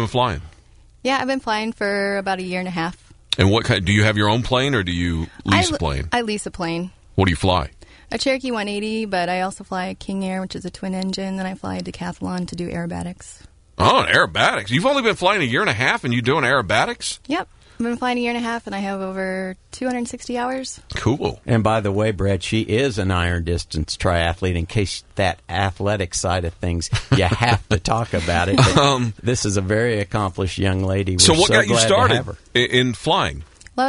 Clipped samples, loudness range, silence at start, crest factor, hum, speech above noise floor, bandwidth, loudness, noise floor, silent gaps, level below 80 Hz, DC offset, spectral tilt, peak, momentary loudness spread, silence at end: under 0.1%; 8 LU; 0 s; 18 dB; none; 29 dB; 11 kHz; -20 LUFS; -49 dBFS; none; -38 dBFS; under 0.1%; -4.5 dB/octave; -2 dBFS; 11 LU; 0 s